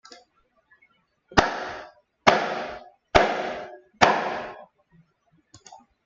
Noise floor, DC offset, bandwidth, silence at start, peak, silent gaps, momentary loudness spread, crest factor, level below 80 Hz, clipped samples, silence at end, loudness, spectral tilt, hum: -66 dBFS; under 0.1%; 7.8 kHz; 0.1 s; -2 dBFS; none; 20 LU; 26 dB; -46 dBFS; under 0.1%; 0.3 s; -23 LUFS; -4 dB/octave; none